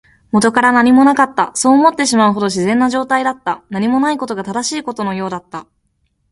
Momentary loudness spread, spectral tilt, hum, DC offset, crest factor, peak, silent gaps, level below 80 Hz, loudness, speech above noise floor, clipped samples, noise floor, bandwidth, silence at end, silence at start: 12 LU; -4 dB/octave; none; under 0.1%; 14 dB; 0 dBFS; none; -54 dBFS; -14 LUFS; 50 dB; under 0.1%; -64 dBFS; 11.5 kHz; 0.7 s; 0.35 s